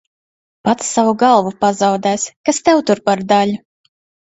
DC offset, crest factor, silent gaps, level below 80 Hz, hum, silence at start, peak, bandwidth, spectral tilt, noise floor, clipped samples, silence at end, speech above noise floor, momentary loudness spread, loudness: under 0.1%; 16 dB; 2.36-2.44 s; -58 dBFS; none; 0.65 s; 0 dBFS; 8.2 kHz; -4 dB/octave; under -90 dBFS; under 0.1%; 0.75 s; over 76 dB; 6 LU; -15 LUFS